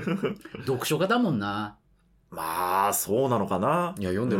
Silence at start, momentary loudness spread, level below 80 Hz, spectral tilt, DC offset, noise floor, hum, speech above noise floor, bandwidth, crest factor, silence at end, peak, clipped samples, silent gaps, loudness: 0 s; 10 LU; -62 dBFS; -5 dB/octave; under 0.1%; -57 dBFS; none; 30 dB; 16.5 kHz; 16 dB; 0 s; -12 dBFS; under 0.1%; none; -27 LUFS